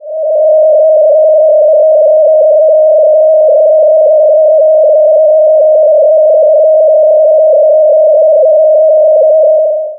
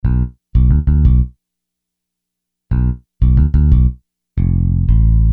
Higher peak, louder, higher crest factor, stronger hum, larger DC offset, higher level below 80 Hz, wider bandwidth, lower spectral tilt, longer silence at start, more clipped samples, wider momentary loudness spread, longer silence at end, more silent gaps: about the same, -2 dBFS vs -2 dBFS; first, -6 LUFS vs -15 LUFS; second, 4 dB vs 12 dB; second, none vs 60 Hz at -25 dBFS; neither; second, -80 dBFS vs -16 dBFS; second, 0.9 kHz vs 2.3 kHz; second, -2 dB/octave vs -12.5 dB/octave; about the same, 0.05 s vs 0.05 s; neither; second, 0 LU vs 8 LU; about the same, 0 s vs 0 s; neither